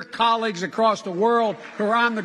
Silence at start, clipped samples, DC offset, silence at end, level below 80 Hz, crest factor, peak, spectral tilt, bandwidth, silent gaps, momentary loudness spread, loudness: 0 s; under 0.1%; under 0.1%; 0 s; -72 dBFS; 14 dB; -6 dBFS; -4.5 dB/octave; 11 kHz; none; 6 LU; -22 LUFS